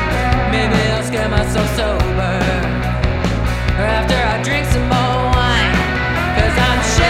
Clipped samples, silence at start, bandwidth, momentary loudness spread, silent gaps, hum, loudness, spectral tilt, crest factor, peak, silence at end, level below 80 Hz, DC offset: under 0.1%; 0 s; 15 kHz; 4 LU; none; none; -16 LUFS; -5 dB/octave; 16 dB; 0 dBFS; 0 s; -22 dBFS; under 0.1%